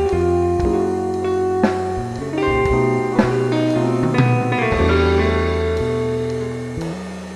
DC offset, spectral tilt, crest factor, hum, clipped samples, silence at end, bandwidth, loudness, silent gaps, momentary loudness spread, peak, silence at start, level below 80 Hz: under 0.1%; -7.5 dB/octave; 16 dB; none; under 0.1%; 0 s; 12 kHz; -19 LUFS; none; 8 LU; -2 dBFS; 0 s; -32 dBFS